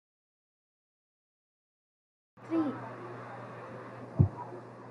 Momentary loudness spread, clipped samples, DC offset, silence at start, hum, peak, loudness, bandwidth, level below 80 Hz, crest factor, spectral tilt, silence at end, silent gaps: 15 LU; under 0.1%; under 0.1%; 2.35 s; none; -10 dBFS; -36 LUFS; 6.4 kHz; -64 dBFS; 28 dB; -10 dB/octave; 0 s; none